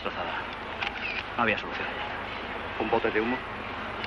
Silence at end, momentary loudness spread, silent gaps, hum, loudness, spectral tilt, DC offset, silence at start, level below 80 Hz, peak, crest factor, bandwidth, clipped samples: 0 s; 8 LU; none; 50 Hz at -50 dBFS; -30 LUFS; -5.5 dB/octave; under 0.1%; 0 s; -52 dBFS; -12 dBFS; 20 dB; 11.5 kHz; under 0.1%